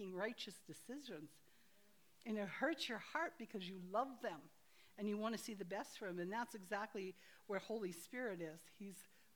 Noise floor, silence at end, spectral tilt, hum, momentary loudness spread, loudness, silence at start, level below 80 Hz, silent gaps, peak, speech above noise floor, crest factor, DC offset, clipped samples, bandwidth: -74 dBFS; 0.3 s; -4.5 dB/octave; none; 13 LU; -47 LUFS; 0 s; under -90 dBFS; none; -26 dBFS; 27 dB; 22 dB; under 0.1%; under 0.1%; over 20 kHz